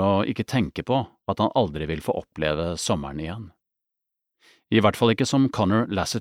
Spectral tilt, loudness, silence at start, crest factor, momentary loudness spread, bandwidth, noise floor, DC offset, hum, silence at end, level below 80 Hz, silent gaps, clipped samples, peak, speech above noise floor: -5.5 dB/octave; -24 LUFS; 0 s; 20 dB; 9 LU; 16 kHz; -84 dBFS; under 0.1%; none; 0 s; -48 dBFS; none; under 0.1%; -4 dBFS; 61 dB